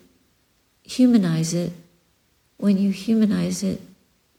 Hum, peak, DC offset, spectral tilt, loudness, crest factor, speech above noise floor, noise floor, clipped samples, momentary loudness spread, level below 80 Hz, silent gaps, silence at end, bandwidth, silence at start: none; -6 dBFS; under 0.1%; -6 dB/octave; -21 LUFS; 16 dB; 45 dB; -64 dBFS; under 0.1%; 13 LU; -60 dBFS; none; 0.55 s; 15.5 kHz; 0.9 s